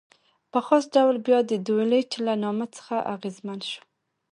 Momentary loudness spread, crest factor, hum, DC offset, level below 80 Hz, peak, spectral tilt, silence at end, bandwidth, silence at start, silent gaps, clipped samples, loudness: 13 LU; 20 dB; none; under 0.1%; -78 dBFS; -6 dBFS; -5.5 dB/octave; 0.55 s; 10.5 kHz; 0.55 s; none; under 0.1%; -25 LUFS